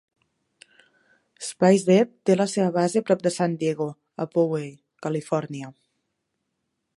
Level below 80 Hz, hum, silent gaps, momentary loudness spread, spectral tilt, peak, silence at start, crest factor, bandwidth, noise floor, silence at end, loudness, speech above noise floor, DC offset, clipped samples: -72 dBFS; none; none; 16 LU; -6 dB/octave; -4 dBFS; 1.4 s; 20 dB; 11.5 kHz; -78 dBFS; 1.25 s; -23 LUFS; 56 dB; under 0.1%; under 0.1%